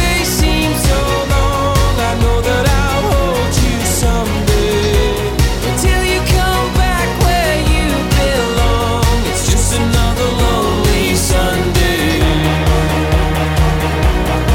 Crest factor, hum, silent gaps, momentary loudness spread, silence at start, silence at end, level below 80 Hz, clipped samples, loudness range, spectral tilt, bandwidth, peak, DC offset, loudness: 10 dB; none; none; 2 LU; 0 s; 0 s; -18 dBFS; under 0.1%; 1 LU; -4.5 dB/octave; 17.5 kHz; -2 dBFS; under 0.1%; -14 LUFS